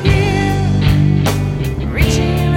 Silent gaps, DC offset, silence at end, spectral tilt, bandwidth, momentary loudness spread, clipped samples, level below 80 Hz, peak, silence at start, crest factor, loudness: none; under 0.1%; 0 s; -6.5 dB/octave; 16.5 kHz; 6 LU; under 0.1%; -22 dBFS; 0 dBFS; 0 s; 12 dB; -15 LUFS